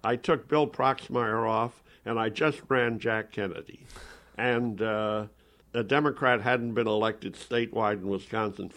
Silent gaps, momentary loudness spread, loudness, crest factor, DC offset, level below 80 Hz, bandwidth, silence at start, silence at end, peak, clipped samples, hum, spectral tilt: none; 13 LU; -28 LUFS; 20 dB; under 0.1%; -60 dBFS; 11 kHz; 0.05 s; 0 s; -8 dBFS; under 0.1%; none; -6.5 dB/octave